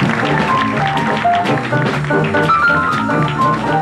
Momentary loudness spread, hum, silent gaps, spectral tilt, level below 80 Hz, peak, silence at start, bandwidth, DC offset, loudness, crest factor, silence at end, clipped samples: 4 LU; none; none; -6.5 dB/octave; -42 dBFS; -4 dBFS; 0 s; 12.5 kHz; under 0.1%; -14 LUFS; 12 dB; 0 s; under 0.1%